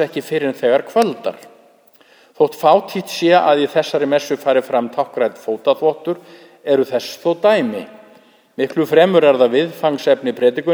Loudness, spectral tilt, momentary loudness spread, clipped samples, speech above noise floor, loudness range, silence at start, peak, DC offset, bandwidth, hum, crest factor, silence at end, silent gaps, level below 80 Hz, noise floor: -16 LUFS; -5.5 dB/octave; 12 LU; under 0.1%; 35 dB; 3 LU; 0 s; 0 dBFS; under 0.1%; over 20 kHz; none; 16 dB; 0 s; none; -72 dBFS; -50 dBFS